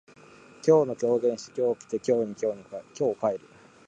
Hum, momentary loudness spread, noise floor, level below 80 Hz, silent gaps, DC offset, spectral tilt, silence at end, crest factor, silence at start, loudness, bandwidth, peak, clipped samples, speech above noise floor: none; 10 LU; -52 dBFS; -72 dBFS; none; under 0.1%; -6.5 dB/octave; 0.5 s; 18 dB; 0.65 s; -27 LUFS; 9.2 kHz; -8 dBFS; under 0.1%; 26 dB